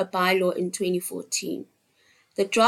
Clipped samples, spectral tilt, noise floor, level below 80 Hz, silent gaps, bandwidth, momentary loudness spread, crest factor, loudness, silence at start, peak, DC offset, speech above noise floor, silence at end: under 0.1%; -3.5 dB/octave; -63 dBFS; -72 dBFS; none; 16.5 kHz; 13 LU; 20 dB; -26 LUFS; 0 s; -6 dBFS; under 0.1%; 39 dB; 0 s